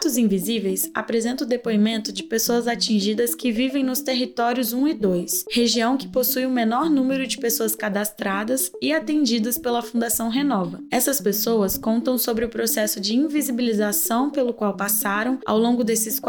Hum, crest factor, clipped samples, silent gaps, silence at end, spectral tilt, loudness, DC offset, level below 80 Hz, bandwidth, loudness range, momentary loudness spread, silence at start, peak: none; 14 dB; under 0.1%; none; 0 s; -3.5 dB/octave; -21 LUFS; under 0.1%; -56 dBFS; 19.5 kHz; 1 LU; 4 LU; 0 s; -8 dBFS